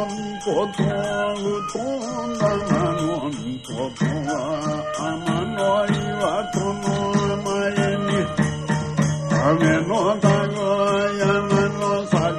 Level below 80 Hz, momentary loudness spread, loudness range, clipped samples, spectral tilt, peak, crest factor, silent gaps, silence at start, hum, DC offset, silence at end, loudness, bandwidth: -48 dBFS; 7 LU; 4 LU; under 0.1%; -6 dB/octave; -4 dBFS; 16 dB; none; 0 s; none; under 0.1%; 0 s; -22 LUFS; 10.5 kHz